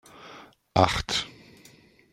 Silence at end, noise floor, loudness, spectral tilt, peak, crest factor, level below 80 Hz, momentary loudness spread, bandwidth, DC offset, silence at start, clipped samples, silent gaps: 0.8 s; -56 dBFS; -25 LUFS; -4 dB/octave; -2 dBFS; 28 dB; -48 dBFS; 23 LU; 15.5 kHz; under 0.1%; 0.2 s; under 0.1%; none